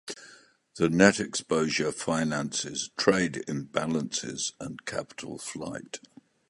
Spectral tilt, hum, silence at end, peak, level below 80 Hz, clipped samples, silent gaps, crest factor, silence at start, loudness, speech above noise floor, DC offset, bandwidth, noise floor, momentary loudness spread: -4 dB/octave; none; 0.5 s; -2 dBFS; -60 dBFS; under 0.1%; none; 26 dB; 0.05 s; -28 LUFS; 28 dB; under 0.1%; 11.5 kHz; -56 dBFS; 17 LU